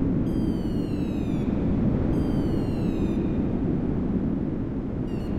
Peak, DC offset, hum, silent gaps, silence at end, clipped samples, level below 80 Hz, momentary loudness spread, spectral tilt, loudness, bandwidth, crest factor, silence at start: -12 dBFS; under 0.1%; none; none; 0 s; under 0.1%; -34 dBFS; 5 LU; -9.5 dB/octave; -26 LUFS; 11.5 kHz; 12 dB; 0 s